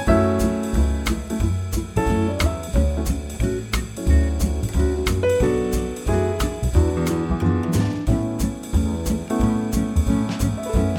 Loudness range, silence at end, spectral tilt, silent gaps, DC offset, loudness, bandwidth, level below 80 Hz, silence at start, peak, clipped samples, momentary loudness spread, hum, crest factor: 1 LU; 0 s; -6.5 dB/octave; none; under 0.1%; -22 LUFS; 17 kHz; -24 dBFS; 0 s; -4 dBFS; under 0.1%; 5 LU; none; 16 dB